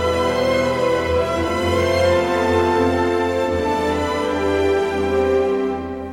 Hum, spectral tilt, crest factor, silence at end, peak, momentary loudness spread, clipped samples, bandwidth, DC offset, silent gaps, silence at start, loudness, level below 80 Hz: none; -5.5 dB/octave; 14 dB; 0 s; -6 dBFS; 3 LU; under 0.1%; 16.5 kHz; under 0.1%; none; 0 s; -19 LUFS; -38 dBFS